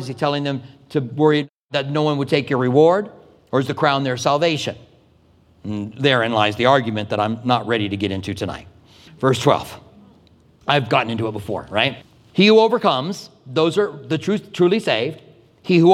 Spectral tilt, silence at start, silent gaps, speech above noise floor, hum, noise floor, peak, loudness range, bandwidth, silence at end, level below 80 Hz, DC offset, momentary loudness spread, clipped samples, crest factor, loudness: -6 dB/octave; 0 s; 1.50-1.69 s; 36 dB; none; -54 dBFS; 0 dBFS; 4 LU; 14.5 kHz; 0 s; -58 dBFS; under 0.1%; 13 LU; under 0.1%; 18 dB; -19 LUFS